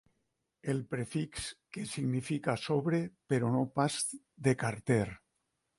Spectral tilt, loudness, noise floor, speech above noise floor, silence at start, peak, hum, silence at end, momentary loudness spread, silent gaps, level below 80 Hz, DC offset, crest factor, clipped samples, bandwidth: -5.5 dB/octave; -34 LUFS; -82 dBFS; 49 dB; 0.65 s; -16 dBFS; none; 0.6 s; 9 LU; none; -64 dBFS; under 0.1%; 20 dB; under 0.1%; 11.5 kHz